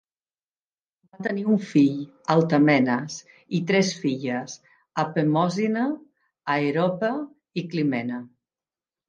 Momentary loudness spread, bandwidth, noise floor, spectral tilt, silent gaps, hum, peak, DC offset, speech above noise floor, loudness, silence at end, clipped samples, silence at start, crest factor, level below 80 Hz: 14 LU; 9 kHz; under -90 dBFS; -6 dB/octave; none; none; -6 dBFS; under 0.1%; over 67 dB; -24 LUFS; 0.8 s; under 0.1%; 1.2 s; 20 dB; -74 dBFS